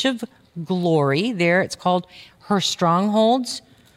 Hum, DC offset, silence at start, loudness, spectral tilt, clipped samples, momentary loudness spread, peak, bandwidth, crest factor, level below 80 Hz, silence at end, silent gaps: none; under 0.1%; 0 s; -20 LUFS; -5 dB/octave; under 0.1%; 13 LU; -6 dBFS; 15 kHz; 14 dB; -64 dBFS; 0.35 s; none